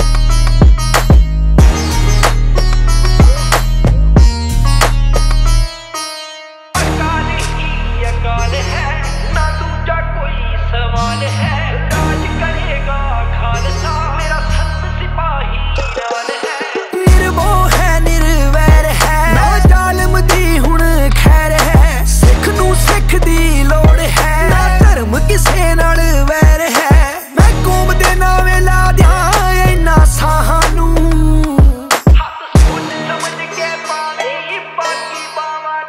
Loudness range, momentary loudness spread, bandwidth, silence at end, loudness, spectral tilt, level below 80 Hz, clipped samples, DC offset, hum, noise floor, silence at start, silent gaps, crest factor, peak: 6 LU; 9 LU; 16 kHz; 0 s; -12 LUFS; -5 dB/octave; -12 dBFS; under 0.1%; under 0.1%; none; -31 dBFS; 0 s; none; 10 dB; 0 dBFS